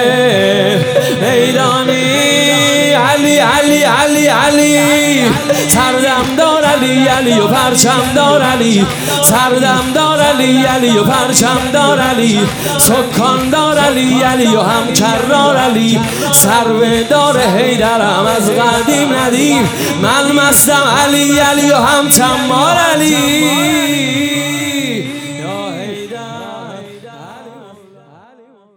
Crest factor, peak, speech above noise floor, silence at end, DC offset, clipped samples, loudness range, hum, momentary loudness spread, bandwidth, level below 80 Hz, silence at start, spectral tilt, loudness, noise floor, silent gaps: 10 dB; 0 dBFS; 34 dB; 1.15 s; under 0.1%; 0.3%; 5 LU; none; 6 LU; over 20 kHz; -42 dBFS; 0 s; -3.5 dB/octave; -10 LUFS; -44 dBFS; none